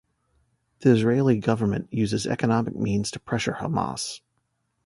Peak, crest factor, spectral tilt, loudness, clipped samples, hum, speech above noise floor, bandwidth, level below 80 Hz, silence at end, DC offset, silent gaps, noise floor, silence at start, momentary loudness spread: -6 dBFS; 20 dB; -6 dB/octave; -24 LUFS; under 0.1%; none; 51 dB; 11.5 kHz; -54 dBFS; 0.7 s; under 0.1%; none; -74 dBFS; 0.8 s; 9 LU